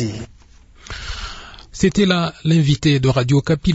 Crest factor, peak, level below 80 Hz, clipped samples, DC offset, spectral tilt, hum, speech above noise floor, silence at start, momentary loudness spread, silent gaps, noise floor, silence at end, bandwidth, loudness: 16 dB; -2 dBFS; -36 dBFS; under 0.1%; under 0.1%; -6 dB/octave; none; 30 dB; 0 s; 19 LU; none; -46 dBFS; 0 s; 8 kHz; -17 LUFS